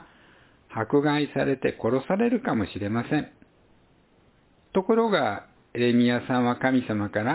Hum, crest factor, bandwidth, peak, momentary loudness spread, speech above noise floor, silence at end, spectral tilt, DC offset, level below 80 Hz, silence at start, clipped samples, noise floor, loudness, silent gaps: none; 18 dB; 4 kHz; -8 dBFS; 7 LU; 36 dB; 0 s; -10.5 dB/octave; under 0.1%; -58 dBFS; 0 s; under 0.1%; -60 dBFS; -25 LUFS; none